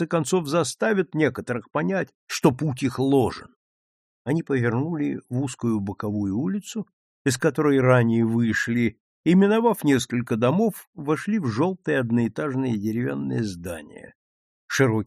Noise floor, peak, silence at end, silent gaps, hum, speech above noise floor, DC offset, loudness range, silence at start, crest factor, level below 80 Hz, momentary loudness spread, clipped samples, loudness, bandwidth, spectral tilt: under -90 dBFS; -4 dBFS; 0 s; 2.15-2.27 s, 3.56-4.25 s, 6.93-7.25 s, 9.00-9.24 s, 10.87-10.93 s, 14.15-14.68 s; none; over 67 dB; under 0.1%; 6 LU; 0 s; 20 dB; -58 dBFS; 9 LU; under 0.1%; -23 LUFS; 14 kHz; -6 dB/octave